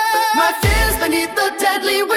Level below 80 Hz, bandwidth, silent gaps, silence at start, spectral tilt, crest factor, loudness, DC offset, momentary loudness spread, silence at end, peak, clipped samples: -26 dBFS; 19 kHz; none; 0 s; -3.5 dB/octave; 14 dB; -16 LUFS; under 0.1%; 2 LU; 0 s; -2 dBFS; under 0.1%